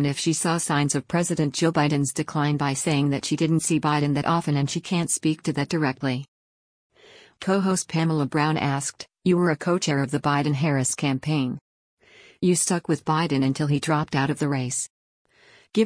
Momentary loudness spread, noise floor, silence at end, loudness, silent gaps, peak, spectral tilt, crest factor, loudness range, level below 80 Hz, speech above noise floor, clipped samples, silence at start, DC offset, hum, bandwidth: 5 LU; -48 dBFS; 0 s; -24 LUFS; 6.28-6.90 s, 11.61-11.97 s, 14.90-15.25 s; -8 dBFS; -5 dB/octave; 16 dB; 3 LU; -60 dBFS; 25 dB; under 0.1%; 0 s; under 0.1%; none; 10.5 kHz